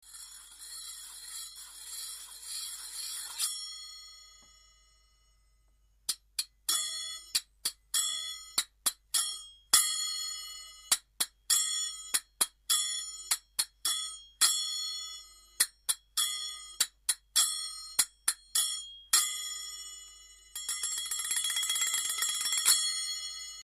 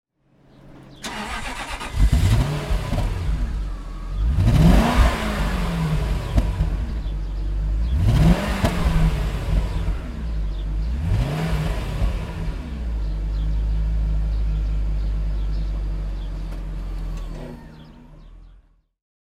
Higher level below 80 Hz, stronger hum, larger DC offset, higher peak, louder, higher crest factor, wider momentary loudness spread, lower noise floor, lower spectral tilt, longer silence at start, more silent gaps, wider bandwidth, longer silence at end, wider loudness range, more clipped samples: second, -68 dBFS vs -24 dBFS; neither; neither; second, -8 dBFS vs -2 dBFS; second, -30 LUFS vs -24 LUFS; first, 26 dB vs 20 dB; about the same, 16 LU vs 14 LU; first, -67 dBFS vs -56 dBFS; second, 4 dB/octave vs -6.5 dB/octave; second, 0.05 s vs 0.65 s; neither; first, 15.5 kHz vs 13.5 kHz; second, 0 s vs 0.85 s; about the same, 10 LU vs 8 LU; neither